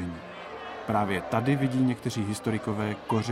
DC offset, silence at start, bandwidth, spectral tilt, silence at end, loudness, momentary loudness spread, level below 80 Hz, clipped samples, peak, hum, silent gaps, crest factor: under 0.1%; 0 s; 14.5 kHz; -6.5 dB/octave; 0 s; -29 LUFS; 13 LU; -58 dBFS; under 0.1%; -10 dBFS; none; none; 18 dB